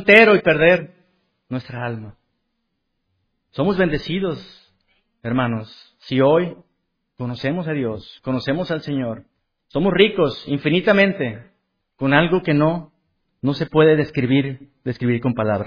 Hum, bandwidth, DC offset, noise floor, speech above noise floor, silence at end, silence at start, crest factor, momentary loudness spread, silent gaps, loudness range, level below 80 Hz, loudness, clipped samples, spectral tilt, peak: none; 5.4 kHz; under 0.1%; -73 dBFS; 55 dB; 0 s; 0 s; 20 dB; 16 LU; none; 7 LU; -48 dBFS; -19 LUFS; under 0.1%; -8 dB/octave; 0 dBFS